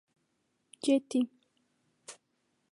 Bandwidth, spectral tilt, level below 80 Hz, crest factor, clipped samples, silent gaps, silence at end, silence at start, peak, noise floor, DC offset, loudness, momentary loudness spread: 11.5 kHz; -3.5 dB/octave; -88 dBFS; 20 dB; under 0.1%; none; 0.6 s; 0.85 s; -16 dBFS; -78 dBFS; under 0.1%; -31 LUFS; 22 LU